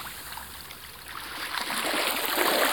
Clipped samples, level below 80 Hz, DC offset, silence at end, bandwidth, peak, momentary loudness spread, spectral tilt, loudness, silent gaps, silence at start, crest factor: under 0.1%; -58 dBFS; 0.1%; 0 s; 19.5 kHz; -4 dBFS; 16 LU; -1 dB/octave; -28 LUFS; none; 0 s; 24 dB